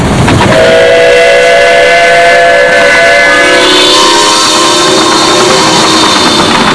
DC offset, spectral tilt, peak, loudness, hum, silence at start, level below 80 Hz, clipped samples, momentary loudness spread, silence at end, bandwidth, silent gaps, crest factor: 2%; -3 dB/octave; 0 dBFS; -3 LUFS; none; 0 s; -28 dBFS; 7%; 2 LU; 0 s; 11 kHz; none; 4 dB